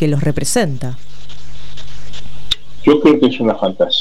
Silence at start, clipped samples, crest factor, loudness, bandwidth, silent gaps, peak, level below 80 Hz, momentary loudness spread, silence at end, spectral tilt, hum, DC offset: 0 s; under 0.1%; 14 dB; -15 LUFS; 14.5 kHz; none; -2 dBFS; -38 dBFS; 24 LU; 0 s; -5 dB/octave; none; 10%